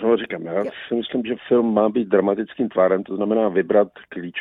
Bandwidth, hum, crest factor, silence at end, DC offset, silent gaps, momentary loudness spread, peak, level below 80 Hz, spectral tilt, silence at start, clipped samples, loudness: 4 kHz; none; 18 dB; 0 s; under 0.1%; none; 8 LU; -4 dBFS; -62 dBFS; -9 dB/octave; 0 s; under 0.1%; -21 LUFS